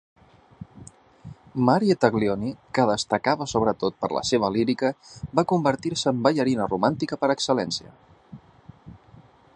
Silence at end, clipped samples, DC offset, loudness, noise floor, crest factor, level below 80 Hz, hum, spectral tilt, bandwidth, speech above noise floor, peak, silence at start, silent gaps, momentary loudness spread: 0.6 s; under 0.1%; under 0.1%; -24 LUFS; -52 dBFS; 24 dB; -56 dBFS; none; -5.5 dB/octave; 10.5 kHz; 29 dB; -2 dBFS; 0.6 s; none; 8 LU